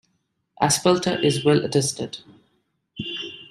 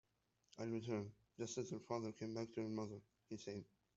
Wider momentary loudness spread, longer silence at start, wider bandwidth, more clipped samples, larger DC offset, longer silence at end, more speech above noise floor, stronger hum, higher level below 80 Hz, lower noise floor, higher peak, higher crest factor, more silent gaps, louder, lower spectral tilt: first, 14 LU vs 10 LU; about the same, 0.6 s vs 0.55 s; first, 15.5 kHz vs 8 kHz; neither; neither; second, 0.05 s vs 0.35 s; first, 51 dB vs 36 dB; neither; first, -60 dBFS vs -82 dBFS; second, -72 dBFS vs -83 dBFS; first, -4 dBFS vs -28 dBFS; about the same, 20 dB vs 20 dB; neither; first, -21 LUFS vs -48 LUFS; second, -4 dB/octave vs -6.5 dB/octave